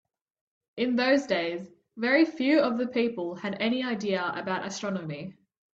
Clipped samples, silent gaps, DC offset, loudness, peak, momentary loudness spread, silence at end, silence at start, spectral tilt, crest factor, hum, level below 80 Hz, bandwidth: under 0.1%; none; under 0.1%; -27 LUFS; -10 dBFS; 15 LU; 0.45 s; 0.75 s; -5 dB/octave; 18 dB; none; -72 dBFS; 7.8 kHz